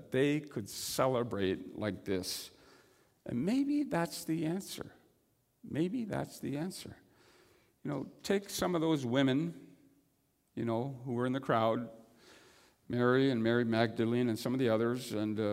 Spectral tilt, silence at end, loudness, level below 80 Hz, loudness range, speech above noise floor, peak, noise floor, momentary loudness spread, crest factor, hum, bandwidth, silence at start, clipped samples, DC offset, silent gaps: -5.5 dB/octave; 0 s; -34 LUFS; -70 dBFS; 7 LU; 42 dB; -14 dBFS; -75 dBFS; 11 LU; 22 dB; none; 16 kHz; 0 s; under 0.1%; under 0.1%; none